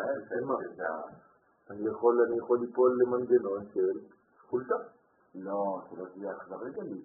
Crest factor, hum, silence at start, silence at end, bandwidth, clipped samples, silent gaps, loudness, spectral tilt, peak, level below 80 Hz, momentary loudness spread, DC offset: 18 dB; none; 0 s; 0 s; 1.9 kHz; under 0.1%; none; -31 LUFS; 1.5 dB/octave; -14 dBFS; -78 dBFS; 15 LU; under 0.1%